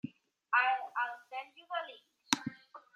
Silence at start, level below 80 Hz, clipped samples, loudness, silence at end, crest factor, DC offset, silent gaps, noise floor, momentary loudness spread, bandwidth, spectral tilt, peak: 0.05 s; -86 dBFS; under 0.1%; -35 LUFS; 0.15 s; 32 dB; under 0.1%; none; -53 dBFS; 18 LU; 14.5 kHz; -1.5 dB/octave; -4 dBFS